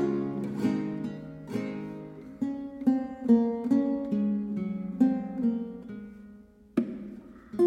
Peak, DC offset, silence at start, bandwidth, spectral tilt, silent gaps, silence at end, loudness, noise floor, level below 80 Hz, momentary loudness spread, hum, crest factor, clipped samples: -12 dBFS; under 0.1%; 0 s; 8.4 kHz; -9 dB/octave; none; 0 s; -30 LUFS; -52 dBFS; -62 dBFS; 17 LU; none; 18 dB; under 0.1%